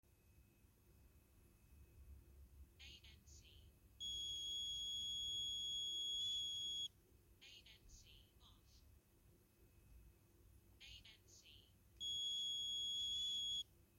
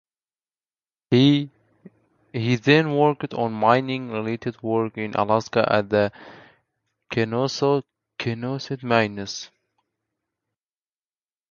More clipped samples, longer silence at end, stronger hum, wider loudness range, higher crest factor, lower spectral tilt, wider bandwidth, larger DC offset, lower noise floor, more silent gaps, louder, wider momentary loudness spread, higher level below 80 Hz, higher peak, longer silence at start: neither; second, 0.15 s vs 2.05 s; neither; first, 23 LU vs 6 LU; second, 12 dB vs 22 dB; second, 0 dB/octave vs -6 dB/octave; first, 16.5 kHz vs 7.2 kHz; neither; second, -72 dBFS vs under -90 dBFS; neither; second, -43 LUFS vs -22 LUFS; first, 23 LU vs 12 LU; second, -70 dBFS vs -62 dBFS; second, -38 dBFS vs -2 dBFS; second, 0.25 s vs 1.1 s